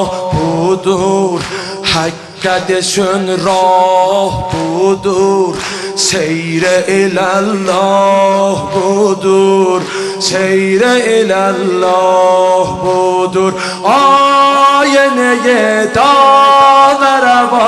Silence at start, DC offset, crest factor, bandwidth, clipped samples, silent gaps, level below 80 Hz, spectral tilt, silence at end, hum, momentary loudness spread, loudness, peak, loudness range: 0 s; under 0.1%; 10 dB; 12.5 kHz; under 0.1%; none; -42 dBFS; -4 dB/octave; 0 s; none; 8 LU; -10 LUFS; 0 dBFS; 5 LU